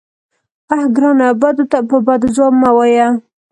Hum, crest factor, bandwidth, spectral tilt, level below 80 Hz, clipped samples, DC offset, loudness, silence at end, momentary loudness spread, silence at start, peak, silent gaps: none; 12 dB; 11.5 kHz; -6 dB/octave; -50 dBFS; under 0.1%; under 0.1%; -12 LUFS; 0.3 s; 6 LU; 0.7 s; 0 dBFS; none